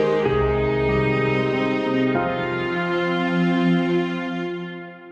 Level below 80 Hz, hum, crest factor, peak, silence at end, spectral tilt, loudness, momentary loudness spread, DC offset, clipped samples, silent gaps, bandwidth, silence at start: -40 dBFS; none; 14 dB; -8 dBFS; 0 s; -8 dB/octave; -21 LUFS; 8 LU; under 0.1%; under 0.1%; none; 7.8 kHz; 0 s